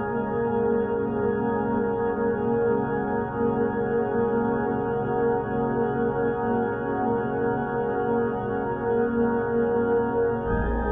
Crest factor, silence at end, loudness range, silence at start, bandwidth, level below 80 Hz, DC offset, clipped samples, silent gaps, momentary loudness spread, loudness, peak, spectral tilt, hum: 12 dB; 0 s; 1 LU; 0 s; 3.5 kHz; -42 dBFS; under 0.1%; under 0.1%; none; 3 LU; -25 LUFS; -12 dBFS; -8 dB/octave; none